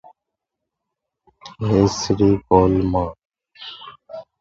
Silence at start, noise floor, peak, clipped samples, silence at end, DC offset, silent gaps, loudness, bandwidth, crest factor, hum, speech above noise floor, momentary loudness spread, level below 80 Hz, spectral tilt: 1.45 s; -82 dBFS; 0 dBFS; under 0.1%; 0.2 s; under 0.1%; 3.25-3.30 s; -18 LUFS; 7.8 kHz; 20 dB; none; 65 dB; 22 LU; -40 dBFS; -6.5 dB/octave